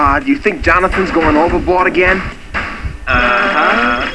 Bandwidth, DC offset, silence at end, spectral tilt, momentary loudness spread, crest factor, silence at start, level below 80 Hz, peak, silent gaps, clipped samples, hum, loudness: 11 kHz; 2%; 0 s; -6 dB/octave; 10 LU; 12 dB; 0 s; -26 dBFS; 0 dBFS; none; under 0.1%; none; -12 LUFS